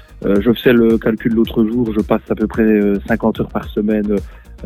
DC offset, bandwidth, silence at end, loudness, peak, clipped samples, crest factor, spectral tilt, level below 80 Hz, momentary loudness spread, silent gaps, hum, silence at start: under 0.1%; 15 kHz; 0 s; -16 LUFS; 0 dBFS; under 0.1%; 16 dB; -8 dB/octave; -34 dBFS; 7 LU; none; none; 0.1 s